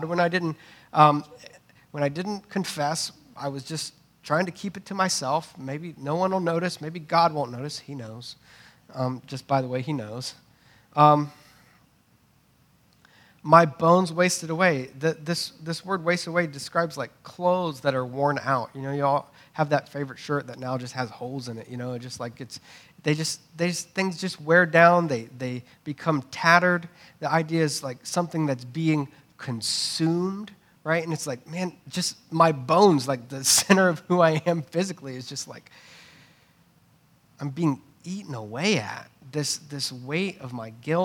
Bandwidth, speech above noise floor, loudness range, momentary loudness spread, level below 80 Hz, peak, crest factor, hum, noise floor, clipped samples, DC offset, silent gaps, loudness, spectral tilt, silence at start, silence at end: 18 kHz; 37 dB; 9 LU; 17 LU; -72 dBFS; 0 dBFS; 26 dB; none; -62 dBFS; under 0.1%; under 0.1%; none; -25 LUFS; -4.5 dB/octave; 0 s; 0 s